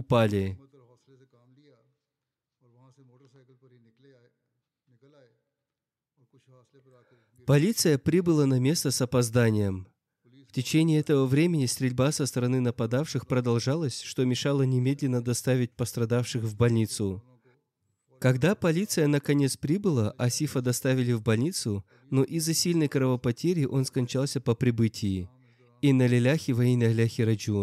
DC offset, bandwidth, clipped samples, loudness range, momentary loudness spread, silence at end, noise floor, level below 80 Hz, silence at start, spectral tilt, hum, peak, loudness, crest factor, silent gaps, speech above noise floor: under 0.1%; 14.5 kHz; under 0.1%; 3 LU; 7 LU; 0 s; -89 dBFS; -66 dBFS; 0 s; -6 dB/octave; none; -12 dBFS; -26 LUFS; 14 dB; none; 64 dB